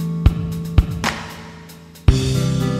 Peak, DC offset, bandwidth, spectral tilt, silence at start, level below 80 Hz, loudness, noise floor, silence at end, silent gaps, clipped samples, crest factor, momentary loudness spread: 0 dBFS; under 0.1%; 15.5 kHz; -6 dB/octave; 0 s; -22 dBFS; -20 LUFS; -40 dBFS; 0 s; none; under 0.1%; 18 dB; 19 LU